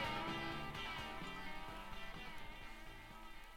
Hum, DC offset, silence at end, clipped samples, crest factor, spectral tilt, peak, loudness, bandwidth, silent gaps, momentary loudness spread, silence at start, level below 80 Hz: none; under 0.1%; 0 s; under 0.1%; 16 dB; -4 dB/octave; -30 dBFS; -48 LUFS; 17 kHz; none; 12 LU; 0 s; -56 dBFS